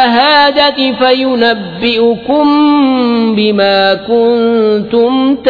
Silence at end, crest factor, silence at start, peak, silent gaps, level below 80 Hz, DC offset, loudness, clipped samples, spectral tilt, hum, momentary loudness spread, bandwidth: 0 s; 10 dB; 0 s; 0 dBFS; none; -46 dBFS; under 0.1%; -9 LUFS; under 0.1%; -7 dB/octave; none; 4 LU; 5 kHz